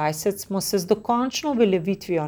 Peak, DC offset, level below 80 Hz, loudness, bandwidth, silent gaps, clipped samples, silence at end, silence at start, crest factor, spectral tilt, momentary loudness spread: -6 dBFS; under 0.1%; -58 dBFS; -23 LUFS; over 20 kHz; none; under 0.1%; 0 s; 0 s; 16 dB; -5 dB/octave; 5 LU